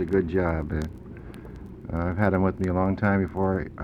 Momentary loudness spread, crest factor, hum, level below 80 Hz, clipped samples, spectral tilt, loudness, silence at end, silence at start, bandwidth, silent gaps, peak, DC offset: 18 LU; 20 dB; none; -40 dBFS; under 0.1%; -9.5 dB/octave; -26 LUFS; 0 s; 0 s; 8 kHz; none; -6 dBFS; under 0.1%